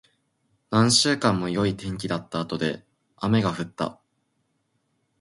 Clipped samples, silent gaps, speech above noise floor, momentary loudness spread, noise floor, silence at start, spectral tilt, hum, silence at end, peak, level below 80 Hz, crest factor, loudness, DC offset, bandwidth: under 0.1%; none; 49 dB; 13 LU; -73 dBFS; 0.7 s; -4.5 dB/octave; none; 1.3 s; -4 dBFS; -54 dBFS; 22 dB; -24 LUFS; under 0.1%; 11.5 kHz